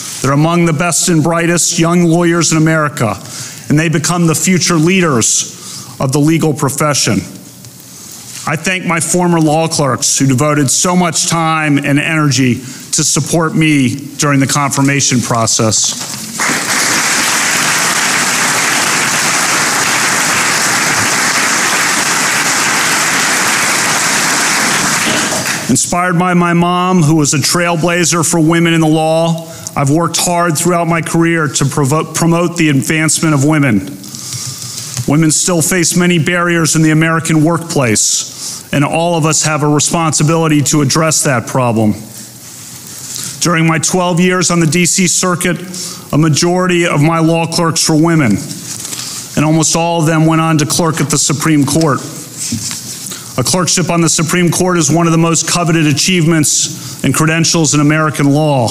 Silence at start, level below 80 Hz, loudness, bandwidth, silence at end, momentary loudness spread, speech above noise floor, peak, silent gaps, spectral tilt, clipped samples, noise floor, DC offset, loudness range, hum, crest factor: 0 s; -44 dBFS; -11 LUFS; 16.5 kHz; 0 s; 9 LU; 22 dB; -2 dBFS; none; -3.5 dB/octave; under 0.1%; -33 dBFS; under 0.1%; 3 LU; none; 10 dB